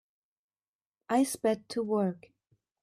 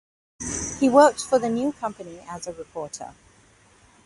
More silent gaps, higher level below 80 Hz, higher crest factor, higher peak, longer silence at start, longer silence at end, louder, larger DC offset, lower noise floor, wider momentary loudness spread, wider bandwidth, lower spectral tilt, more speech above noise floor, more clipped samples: neither; second, -76 dBFS vs -52 dBFS; second, 16 dB vs 22 dB; second, -16 dBFS vs -4 dBFS; first, 1.1 s vs 0.4 s; second, 0.65 s vs 0.95 s; second, -30 LUFS vs -22 LUFS; neither; first, under -90 dBFS vs -56 dBFS; second, 6 LU vs 21 LU; first, 14.5 kHz vs 11.5 kHz; first, -5.5 dB/octave vs -4 dB/octave; first, over 60 dB vs 34 dB; neither